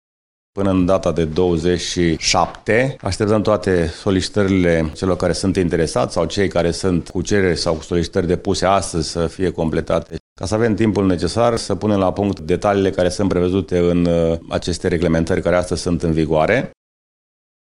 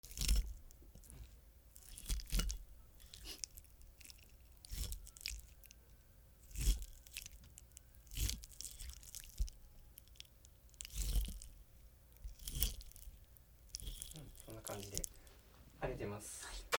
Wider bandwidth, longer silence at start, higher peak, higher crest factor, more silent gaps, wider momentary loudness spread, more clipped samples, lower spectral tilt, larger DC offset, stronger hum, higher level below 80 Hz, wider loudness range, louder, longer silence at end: second, 11.5 kHz vs over 20 kHz; first, 0.55 s vs 0.05 s; first, 0 dBFS vs -12 dBFS; second, 16 dB vs 34 dB; first, 10.20-10.36 s vs none; second, 5 LU vs 22 LU; neither; first, -5.5 dB/octave vs -3 dB/octave; neither; neither; first, -40 dBFS vs -46 dBFS; about the same, 2 LU vs 4 LU; first, -18 LUFS vs -46 LUFS; first, 1.1 s vs 0 s